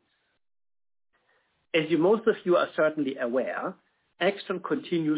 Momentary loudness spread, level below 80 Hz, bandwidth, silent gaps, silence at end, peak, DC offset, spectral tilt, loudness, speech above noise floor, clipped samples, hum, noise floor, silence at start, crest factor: 9 LU; -76 dBFS; 4 kHz; none; 0 s; -12 dBFS; under 0.1%; -9.5 dB/octave; -27 LUFS; 44 dB; under 0.1%; none; -70 dBFS; 1.75 s; 16 dB